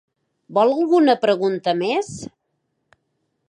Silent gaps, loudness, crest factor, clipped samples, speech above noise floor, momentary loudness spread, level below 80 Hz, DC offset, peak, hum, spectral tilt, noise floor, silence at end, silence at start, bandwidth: none; -19 LUFS; 16 dB; under 0.1%; 55 dB; 16 LU; -64 dBFS; under 0.1%; -4 dBFS; none; -5.5 dB/octave; -73 dBFS; 1.25 s; 0.5 s; 11 kHz